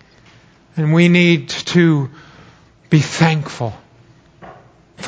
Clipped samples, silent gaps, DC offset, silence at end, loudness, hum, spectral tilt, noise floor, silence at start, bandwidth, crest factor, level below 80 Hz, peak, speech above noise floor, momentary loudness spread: under 0.1%; none; under 0.1%; 0 s; -15 LUFS; none; -6 dB/octave; -48 dBFS; 0.75 s; 8 kHz; 18 dB; -54 dBFS; 0 dBFS; 34 dB; 15 LU